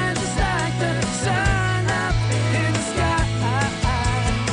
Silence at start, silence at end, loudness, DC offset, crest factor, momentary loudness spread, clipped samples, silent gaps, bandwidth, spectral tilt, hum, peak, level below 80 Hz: 0 s; 0 s; -21 LUFS; under 0.1%; 16 dB; 2 LU; under 0.1%; none; 10 kHz; -4.5 dB/octave; none; -6 dBFS; -30 dBFS